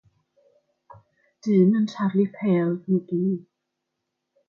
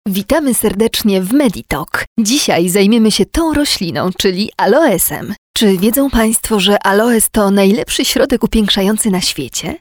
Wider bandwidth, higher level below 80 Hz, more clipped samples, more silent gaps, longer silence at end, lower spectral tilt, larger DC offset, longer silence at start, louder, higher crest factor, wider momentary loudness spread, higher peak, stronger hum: second, 6.8 kHz vs over 20 kHz; second, -74 dBFS vs -34 dBFS; neither; second, none vs 2.07-2.16 s, 5.38-5.54 s; first, 1.1 s vs 0.05 s; first, -9 dB/octave vs -4 dB/octave; neither; first, 1.45 s vs 0.05 s; second, -23 LUFS vs -12 LUFS; about the same, 16 dB vs 12 dB; first, 8 LU vs 5 LU; second, -8 dBFS vs 0 dBFS; neither